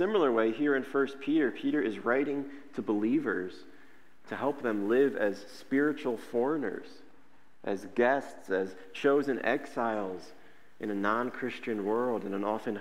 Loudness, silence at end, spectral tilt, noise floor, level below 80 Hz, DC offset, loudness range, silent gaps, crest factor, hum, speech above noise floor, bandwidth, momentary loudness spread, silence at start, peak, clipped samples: -31 LUFS; 0 s; -6.5 dB/octave; -64 dBFS; -78 dBFS; 0.4%; 2 LU; none; 18 dB; none; 33 dB; 15 kHz; 10 LU; 0 s; -12 dBFS; under 0.1%